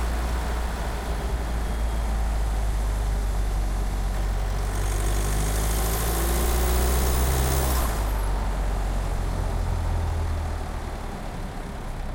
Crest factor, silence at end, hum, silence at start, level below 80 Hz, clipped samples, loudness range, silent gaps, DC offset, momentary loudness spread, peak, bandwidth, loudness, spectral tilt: 14 dB; 0 s; none; 0 s; -26 dBFS; under 0.1%; 5 LU; none; under 0.1%; 9 LU; -12 dBFS; 16.5 kHz; -27 LUFS; -5 dB/octave